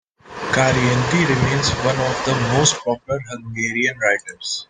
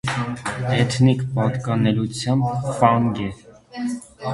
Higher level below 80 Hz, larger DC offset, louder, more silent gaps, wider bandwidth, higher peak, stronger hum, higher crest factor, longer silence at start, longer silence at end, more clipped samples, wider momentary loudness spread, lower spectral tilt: first, -44 dBFS vs -50 dBFS; neither; first, -18 LUFS vs -21 LUFS; neither; second, 9.8 kHz vs 11.5 kHz; about the same, -2 dBFS vs 0 dBFS; neither; about the same, 18 dB vs 20 dB; first, 0.25 s vs 0.05 s; about the same, 0.05 s vs 0 s; neither; about the same, 10 LU vs 12 LU; second, -4 dB/octave vs -6.5 dB/octave